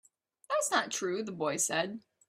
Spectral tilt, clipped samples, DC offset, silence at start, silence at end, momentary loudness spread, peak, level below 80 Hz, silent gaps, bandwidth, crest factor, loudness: -2 dB/octave; under 0.1%; under 0.1%; 0.5 s; 0.3 s; 6 LU; -14 dBFS; -78 dBFS; none; 16 kHz; 20 dB; -32 LUFS